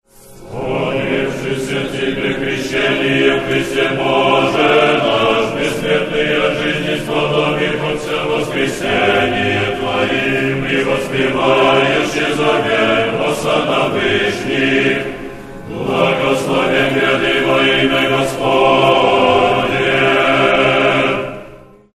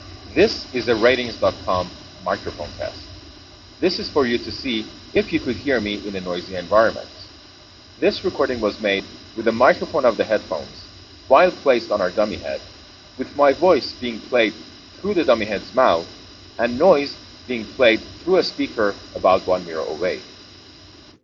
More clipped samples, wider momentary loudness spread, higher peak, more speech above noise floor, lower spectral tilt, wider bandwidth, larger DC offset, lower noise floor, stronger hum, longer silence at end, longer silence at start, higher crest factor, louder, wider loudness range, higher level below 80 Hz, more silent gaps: neither; second, 7 LU vs 17 LU; about the same, 0 dBFS vs -2 dBFS; about the same, 24 dB vs 25 dB; first, -5 dB/octave vs -3 dB/octave; first, 13 kHz vs 7.4 kHz; neither; second, -38 dBFS vs -45 dBFS; neither; second, 0.4 s vs 0.8 s; first, 0.25 s vs 0 s; second, 14 dB vs 20 dB; first, -14 LUFS vs -20 LUFS; about the same, 4 LU vs 4 LU; first, -40 dBFS vs -50 dBFS; neither